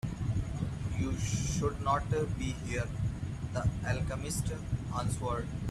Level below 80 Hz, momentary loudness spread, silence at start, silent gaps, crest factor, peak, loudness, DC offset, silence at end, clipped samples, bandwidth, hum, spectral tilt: -42 dBFS; 5 LU; 0.05 s; none; 16 dB; -16 dBFS; -34 LUFS; under 0.1%; 0 s; under 0.1%; 13.5 kHz; none; -5.5 dB/octave